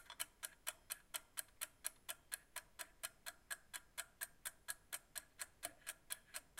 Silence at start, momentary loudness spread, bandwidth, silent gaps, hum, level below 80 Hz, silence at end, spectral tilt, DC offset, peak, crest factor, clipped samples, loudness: 0 s; 5 LU; 16.5 kHz; none; none; -76 dBFS; 0 s; 1.5 dB/octave; under 0.1%; -24 dBFS; 30 dB; under 0.1%; -50 LUFS